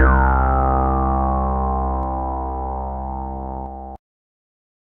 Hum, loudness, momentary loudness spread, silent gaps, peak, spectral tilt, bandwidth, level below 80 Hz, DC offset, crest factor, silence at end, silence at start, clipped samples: none; -21 LUFS; 13 LU; none; -4 dBFS; -12.5 dB/octave; 2.6 kHz; -22 dBFS; under 0.1%; 16 dB; 0.85 s; 0 s; under 0.1%